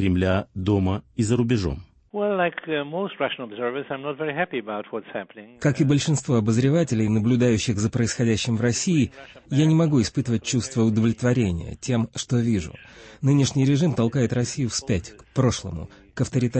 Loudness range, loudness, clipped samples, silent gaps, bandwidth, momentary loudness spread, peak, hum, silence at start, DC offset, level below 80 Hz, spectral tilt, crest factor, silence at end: 5 LU; -23 LUFS; under 0.1%; none; 8.8 kHz; 10 LU; -8 dBFS; none; 0 s; under 0.1%; -48 dBFS; -6 dB/octave; 14 dB; 0 s